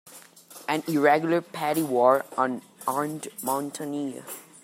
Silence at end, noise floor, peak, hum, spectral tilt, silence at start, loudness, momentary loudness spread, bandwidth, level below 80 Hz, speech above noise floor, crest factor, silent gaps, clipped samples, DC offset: 0.2 s; -49 dBFS; -6 dBFS; none; -5 dB/octave; 0.05 s; -26 LUFS; 13 LU; 16 kHz; -76 dBFS; 24 dB; 20 dB; none; under 0.1%; under 0.1%